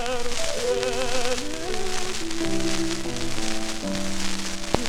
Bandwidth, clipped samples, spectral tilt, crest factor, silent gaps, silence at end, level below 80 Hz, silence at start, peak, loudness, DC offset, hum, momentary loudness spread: 14 kHz; under 0.1%; -3 dB/octave; 22 dB; none; 0 s; -34 dBFS; 0 s; 0 dBFS; -27 LUFS; under 0.1%; none; 4 LU